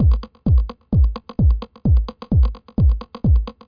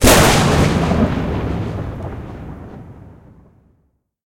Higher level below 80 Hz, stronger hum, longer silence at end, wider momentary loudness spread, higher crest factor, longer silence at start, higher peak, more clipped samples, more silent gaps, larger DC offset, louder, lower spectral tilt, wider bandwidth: first, -18 dBFS vs -26 dBFS; neither; second, 0.15 s vs 1.15 s; second, 3 LU vs 23 LU; second, 10 dB vs 18 dB; about the same, 0 s vs 0 s; second, -8 dBFS vs 0 dBFS; neither; neither; neither; second, -20 LUFS vs -16 LUFS; first, -11 dB/octave vs -4.5 dB/octave; second, 5.2 kHz vs 17 kHz